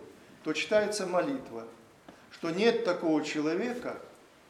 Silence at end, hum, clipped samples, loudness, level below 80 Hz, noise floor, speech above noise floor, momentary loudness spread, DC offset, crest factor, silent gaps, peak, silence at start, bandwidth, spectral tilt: 0.35 s; none; under 0.1%; -30 LUFS; -74 dBFS; -55 dBFS; 25 dB; 17 LU; under 0.1%; 20 dB; none; -12 dBFS; 0 s; 13.5 kHz; -4.5 dB/octave